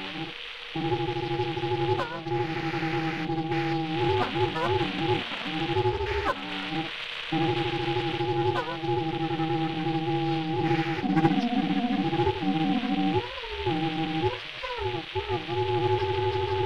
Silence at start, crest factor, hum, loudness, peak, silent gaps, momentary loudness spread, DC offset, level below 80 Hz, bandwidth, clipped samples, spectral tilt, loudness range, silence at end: 0 s; 20 dB; none; -28 LUFS; -8 dBFS; none; 5 LU; 0.5%; -50 dBFS; 10.5 kHz; under 0.1%; -7 dB/octave; 3 LU; 0 s